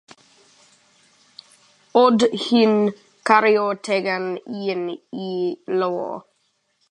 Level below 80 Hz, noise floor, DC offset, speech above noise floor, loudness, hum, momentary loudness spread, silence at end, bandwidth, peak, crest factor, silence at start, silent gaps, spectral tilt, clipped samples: -72 dBFS; -68 dBFS; under 0.1%; 49 dB; -20 LUFS; none; 13 LU; 0.7 s; 10.5 kHz; 0 dBFS; 20 dB; 1.95 s; none; -5 dB/octave; under 0.1%